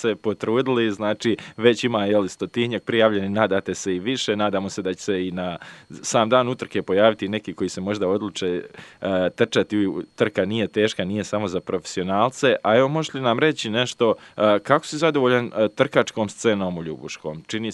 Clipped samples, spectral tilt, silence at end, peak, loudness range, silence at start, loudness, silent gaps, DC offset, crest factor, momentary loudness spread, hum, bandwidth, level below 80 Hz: under 0.1%; -5 dB/octave; 0 s; 0 dBFS; 3 LU; 0 s; -22 LUFS; none; under 0.1%; 22 dB; 9 LU; none; 11.5 kHz; -64 dBFS